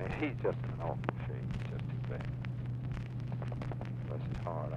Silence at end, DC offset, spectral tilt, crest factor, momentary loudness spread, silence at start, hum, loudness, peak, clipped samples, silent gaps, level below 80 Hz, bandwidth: 0 s; under 0.1%; -9 dB/octave; 22 dB; 4 LU; 0 s; none; -39 LUFS; -16 dBFS; under 0.1%; none; -50 dBFS; 6.4 kHz